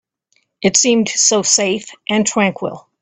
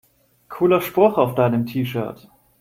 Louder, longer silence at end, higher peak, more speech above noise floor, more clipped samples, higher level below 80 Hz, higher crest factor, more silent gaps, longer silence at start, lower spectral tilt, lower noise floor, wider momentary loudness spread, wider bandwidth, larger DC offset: first, -14 LUFS vs -19 LUFS; second, 0.2 s vs 0.45 s; about the same, 0 dBFS vs -2 dBFS; first, 48 dB vs 27 dB; neither; about the same, -58 dBFS vs -58 dBFS; about the same, 16 dB vs 18 dB; neither; about the same, 0.6 s vs 0.5 s; second, -2.5 dB/octave vs -7.5 dB/octave; first, -64 dBFS vs -46 dBFS; about the same, 10 LU vs 12 LU; second, 9.4 kHz vs 16.5 kHz; neither